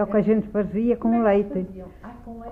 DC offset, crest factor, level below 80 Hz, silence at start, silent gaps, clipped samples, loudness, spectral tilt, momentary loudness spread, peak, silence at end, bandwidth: under 0.1%; 14 dB; -46 dBFS; 0 s; none; under 0.1%; -22 LUFS; -10 dB/octave; 20 LU; -8 dBFS; 0 s; 3.5 kHz